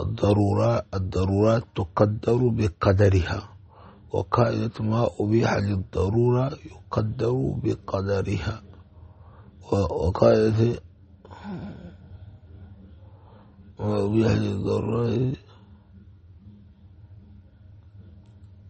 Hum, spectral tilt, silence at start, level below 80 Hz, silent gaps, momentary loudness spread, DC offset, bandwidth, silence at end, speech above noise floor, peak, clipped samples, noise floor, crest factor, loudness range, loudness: none; -8 dB/octave; 0 s; -44 dBFS; none; 16 LU; under 0.1%; 8.4 kHz; 0 s; 27 dB; -4 dBFS; under 0.1%; -50 dBFS; 22 dB; 8 LU; -24 LUFS